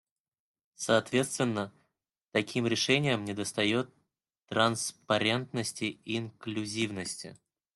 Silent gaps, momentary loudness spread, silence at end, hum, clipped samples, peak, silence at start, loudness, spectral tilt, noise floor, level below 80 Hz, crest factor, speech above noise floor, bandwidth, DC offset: none; 11 LU; 0.4 s; none; under 0.1%; -10 dBFS; 0.8 s; -30 LUFS; -4 dB/octave; -81 dBFS; -72 dBFS; 22 dB; 51 dB; 12.5 kHz; under 0.1%